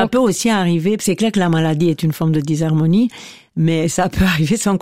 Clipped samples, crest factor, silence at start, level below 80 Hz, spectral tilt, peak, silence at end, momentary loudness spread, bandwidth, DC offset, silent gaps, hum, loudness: under 0.1%; 14 dB; 0 s; -38 dBFS; -5.5 dB/octave; -2 dBFS; 0 s; 3 LU; 16 kHz; 0.6%; none; none; -16 LUFS